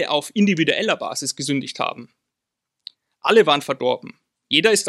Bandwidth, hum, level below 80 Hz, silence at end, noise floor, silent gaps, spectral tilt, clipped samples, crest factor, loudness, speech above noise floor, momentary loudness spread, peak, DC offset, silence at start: 14 kHz; none; -74 dBFS; 0 s; -83 dBFS; none; -3.5 dB/octave; under 0.1%; 20 dB; -20 LUFS; 63 dB; 11 LU; 0 dBFS; under 0.1%; 0 s